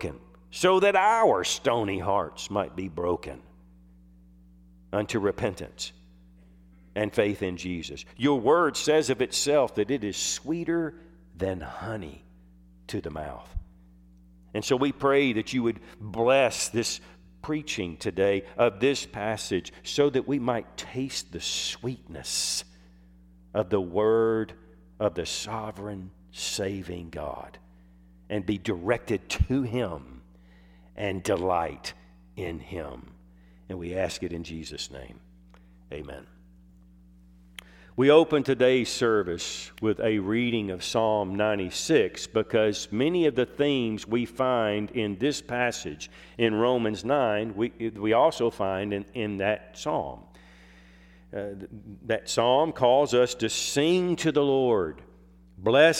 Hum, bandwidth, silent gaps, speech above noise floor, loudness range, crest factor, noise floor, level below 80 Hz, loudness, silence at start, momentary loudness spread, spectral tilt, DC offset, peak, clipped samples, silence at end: none; 16 kHz; none; 28 dB; 10 LU; 22 dB; -54 dBFS; -50 dBFS; -27 LUFS; 0 s; 16 LU; -4.5 dB/octave; under 0.1%; -6 dBFS; under 0.1%; 0 s